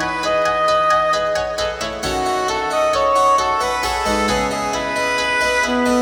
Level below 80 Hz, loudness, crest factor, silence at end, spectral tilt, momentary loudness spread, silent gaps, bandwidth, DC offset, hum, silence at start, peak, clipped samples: -38 dBFS; -17 LUFS; 14 dB; 0 s; -3 dB/octave; 6 LU; none; 18.5 kHz; under 0.1%; none; 0 s; -4 dBFS; under 0.1%